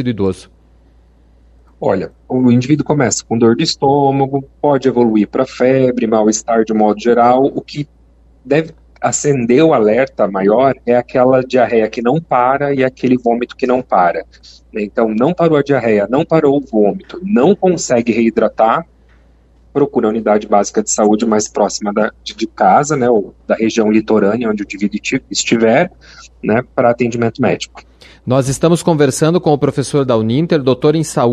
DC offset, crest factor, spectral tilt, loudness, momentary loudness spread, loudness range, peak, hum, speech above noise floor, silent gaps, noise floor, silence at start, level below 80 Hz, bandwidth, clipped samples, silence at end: under 0.1%; 14 dB; -5.5 dB/octave; -13 LUFS; 7 LU; 2 LU; 0 dBFS; none; 34 dB; none; -47 dBFS; 0 s; -46 dBFS; 12.5 kHz; under 0.1%; 0 s